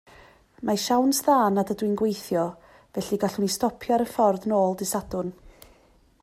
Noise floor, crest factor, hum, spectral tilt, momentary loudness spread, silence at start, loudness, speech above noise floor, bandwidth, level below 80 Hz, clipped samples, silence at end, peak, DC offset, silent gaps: -59 dBFS; 18 dB; none; -5 dB/octave; 11 LU; 0.6 s; -25 LUFS; 35 dB; 16 kHz; -56 dBFS; under 0.1%; 0.75 s; -8 dBFS; under 0.1%; none